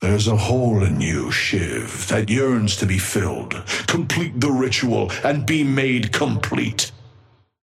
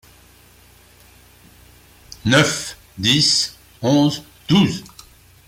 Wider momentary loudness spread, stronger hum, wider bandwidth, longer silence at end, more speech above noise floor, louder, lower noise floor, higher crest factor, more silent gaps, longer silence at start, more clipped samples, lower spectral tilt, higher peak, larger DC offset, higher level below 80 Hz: second, 5 LU vs 13 LU; second, none vs 60 Hz at -45 dBFS; about the same, 15.5 kHz vs 16.5 kHz; about the same, 0.55 s vs 0.65 s; about the same, 33 dB vs 33 dB; second, -20 LUFS vs -17 LUFS; first, -53 dBFS vs -49 dBFS; about the same, 16 dB vs 18 dB; neither; second, 0 s vs 2.25 s; neither; about the same, -5 dB/octave vs -4 dB/octave; about the same, -4 dBFS vs -2 dBFS; neither; first, -44 dBFS vs -50 dBFS